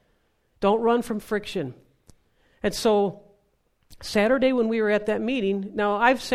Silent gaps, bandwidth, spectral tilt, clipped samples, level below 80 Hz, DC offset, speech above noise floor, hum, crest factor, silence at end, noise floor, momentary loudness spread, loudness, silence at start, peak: none; 15 kHz; -5 dB/octave; under 0.1%; -54 dBFS; under 0.1%; 45 dB; none; 20 dB; 0 s; -68 dBFS; 9 LU; -24 LUFS; 0.6 s; -4 dBFS